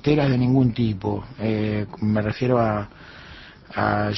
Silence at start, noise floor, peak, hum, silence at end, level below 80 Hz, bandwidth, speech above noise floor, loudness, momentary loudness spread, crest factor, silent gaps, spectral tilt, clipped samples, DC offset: 0.05 s; -43 dBFS; -4 dBFS; none; 0 s; -44 dBFS; 6 kHz; 22 dB; -22 LUFS; 22 LU; 18 dB; none; -9 dB/octave; under 0.1%; under 0.1%